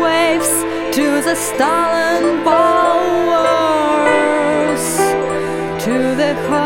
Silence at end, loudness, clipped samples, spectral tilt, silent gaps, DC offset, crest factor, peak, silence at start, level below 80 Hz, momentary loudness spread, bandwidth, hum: 0 s; -14 LUFS; under 0.1%; -3.5 dB/octave; none; under 0.1%; 14 dB; 0 dBFS; 0 s; -48 dBFS; 5 LU; 17.5 kHz; none